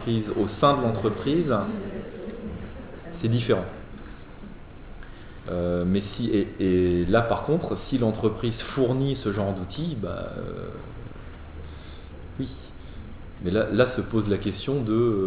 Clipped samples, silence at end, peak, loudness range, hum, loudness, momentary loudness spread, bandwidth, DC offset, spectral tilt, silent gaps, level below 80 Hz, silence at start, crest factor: under 0.1%; 0 s; -6 dBFS; 9 LU; none; -26 LUFS; 20 LU; 4 kHz; under 0.1%; -11.5 dB/octave; none; -42 dBFS; 0 s; 20 dB